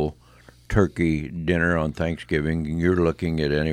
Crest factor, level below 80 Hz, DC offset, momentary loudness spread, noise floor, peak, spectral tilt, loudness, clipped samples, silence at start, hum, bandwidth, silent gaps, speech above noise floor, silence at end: 18 dB; -38 dBFS; under 0.1%; 5 LU; -51 dBFS; -4 dBFS; -7.5 dB/octave; -23 LUFS; under 0.1%; 0 s; none; 10.5 kHz; none; 29 dB; 0 s